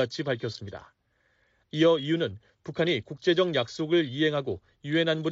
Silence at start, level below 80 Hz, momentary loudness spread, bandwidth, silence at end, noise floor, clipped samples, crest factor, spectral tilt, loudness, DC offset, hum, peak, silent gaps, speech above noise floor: 0 s; -66 dBFS; 15 LU; 7.6 kHz; 0 s; -70 dBFS; under 0.1%; 16 dB; -4 dB/octave; -27 LUFS; under 0.1%; none; -12 dBFS; none; 43 dB